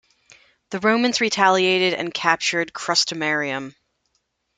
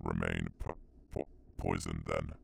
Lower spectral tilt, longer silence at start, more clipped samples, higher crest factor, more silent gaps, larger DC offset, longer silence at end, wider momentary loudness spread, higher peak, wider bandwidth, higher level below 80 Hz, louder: second, -2.5 dB/octave vs -6 dB/octave; first, 0.7 s vs 0.05 s; neither; about the same, 22 dB vs 20 dB; neither; neither; first, 0.85 s vs 0.05 s; about the same, 10 LU vs 10 LU; first, -2 dBFS vs -18 dBFS; second, 9.6 kHz vs 14.5 kHz; second, -68 dBFS vs -48 dBFS; first, -20 LUFS vs -39 LUFS